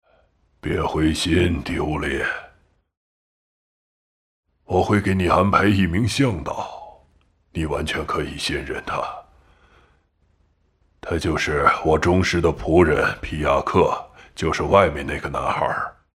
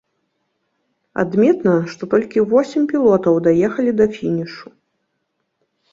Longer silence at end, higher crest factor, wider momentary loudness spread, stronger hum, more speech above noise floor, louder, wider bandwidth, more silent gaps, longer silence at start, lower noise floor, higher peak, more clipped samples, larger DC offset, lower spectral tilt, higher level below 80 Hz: second, 0.25 s vs 1.3 s; first, 22 dB vs 16 dB; first, 12 LU vs 9 LU; neither; second, 43 dB vs 56 dB; second, -21 LUFS vs -16 LUFS; first, 15 kHz vs 7.6 kHz; first, 2.97-4.43 s vs none; second, 0.65 s vs 1.15 s; second, -63 dBFS vs -72 dBFS; about the same, -2 dBFS vs -2 dBFS; neither; neither; second, -6 dB/octave vs -8 dB/octave; first, -40 dBFS vs -56 dBFS